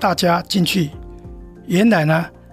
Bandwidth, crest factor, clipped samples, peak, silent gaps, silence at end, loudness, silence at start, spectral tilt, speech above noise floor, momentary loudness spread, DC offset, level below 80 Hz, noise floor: 16 kHz; 14 dB; under 0.1%; -4 dBFS; none; 0.25 s; -17 LUFS; 0 s; -5.5 dB/octave; 20 dB; 23 LU; under 0.1%; -42 dBFS; -37 dBFS